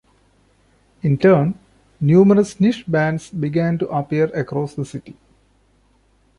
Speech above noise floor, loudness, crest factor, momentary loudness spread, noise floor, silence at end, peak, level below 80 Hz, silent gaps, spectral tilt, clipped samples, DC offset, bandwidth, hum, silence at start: 41 dB; -18 LUFS; 16 dB; 13 LU; -58 dBFS; 1.25 s; -2 dBFS; -54 dBFS; none; -8 dB/octave; under 0.1%; under 0.1%; 11.5 kHz; none; 1.05 s